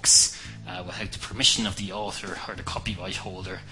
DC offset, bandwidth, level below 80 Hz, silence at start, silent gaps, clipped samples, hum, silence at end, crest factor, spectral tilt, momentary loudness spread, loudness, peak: under 0.1%; 11.5 kHz; -48 dBFS; 0 s; none; under 0.1%; none; 0 s; 22 dB; -1 dB/octave; 17 LU; -25 LUFS; -4 dBFS